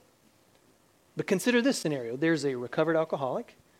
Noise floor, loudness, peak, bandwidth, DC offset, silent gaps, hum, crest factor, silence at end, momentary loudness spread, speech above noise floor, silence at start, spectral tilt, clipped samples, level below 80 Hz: -64 dBFS; -29 LUFS; -12 dBFS; 16.5 kHz; under 0.1%; none; none; 18 dB; 0.35 s; 10 LU; 36 dB; 1.15 s; -5 dB/octave; under 0.1%; -78 dBFS